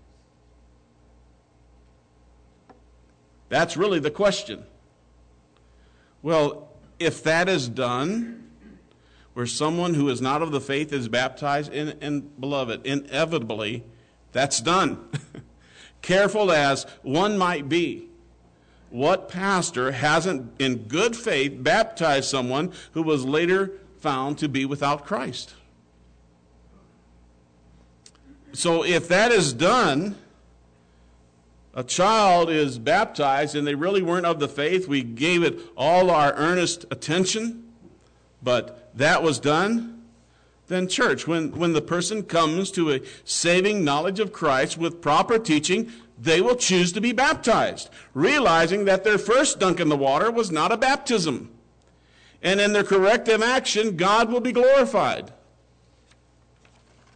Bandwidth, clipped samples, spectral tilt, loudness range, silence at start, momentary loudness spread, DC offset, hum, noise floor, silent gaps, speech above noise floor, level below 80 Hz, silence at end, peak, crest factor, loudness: 9.4 kHz; under 0.1%; -4 dB/octave; 7 LU; 3.5 s; 11 LU; under 0.1%; none; -58 dBFS; none; 36 dB; -56 dBFS; 1.85 s; -12 dBFS; 12 dB; -22 LUFS